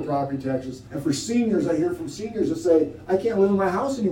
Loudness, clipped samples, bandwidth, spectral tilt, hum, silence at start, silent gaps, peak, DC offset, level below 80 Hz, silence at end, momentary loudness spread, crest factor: -23 LUFS; under 0.1%; 17 kHz; -6 dB/octave; none; 0 s; none; -8 dBFS; under 0.1%; -54 dBFS; 0 s; 9 LU; 16 dB